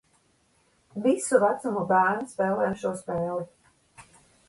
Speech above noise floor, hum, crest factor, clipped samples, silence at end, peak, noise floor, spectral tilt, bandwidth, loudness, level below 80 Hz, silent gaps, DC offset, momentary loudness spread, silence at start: 41 dB; none; 20 dB; under 0.1%; 0.45 s; -8 dBFS; -66 dBFS; -5.5 dB/octave; 11.5 kHz; -26 LUFS; -66 dBFS; none; under 0.1%; 10 LU; 0.95 s